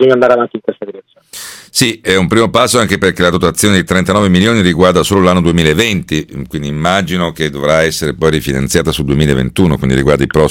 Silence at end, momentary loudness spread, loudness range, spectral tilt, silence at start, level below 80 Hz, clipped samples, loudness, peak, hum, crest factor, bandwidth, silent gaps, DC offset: 0 s; 10 LU; 3 LU; -5 dB/octave; 0 s; -32 dBFS; 0.6%; -11 LUFS; 0 dBFS; none; 12 dB; 17 kHz; none; under 0.1%